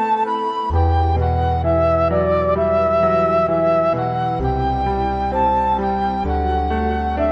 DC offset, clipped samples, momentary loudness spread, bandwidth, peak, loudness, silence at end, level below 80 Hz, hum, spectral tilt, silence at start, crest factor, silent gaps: under 0.1%; under 0.1%; 4 LU; 6.2 kHz; -6 dBFS; -18 LUFS; 0 s; -30 dBFS; none; -9 dB/octave; 0 s; 12 dB; none